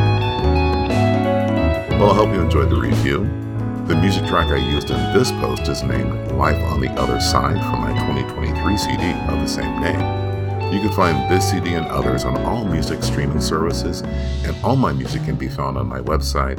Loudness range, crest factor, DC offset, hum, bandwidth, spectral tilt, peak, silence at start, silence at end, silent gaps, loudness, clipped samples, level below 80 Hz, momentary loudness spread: 3 LU; 18 dB; under 0.1%; none; 18 kHz; -6 dB/octave; 0 dBFS; 0 s; 0 s; none; -19 LUFS; under 0.1%; -28 dBFS; 6 LU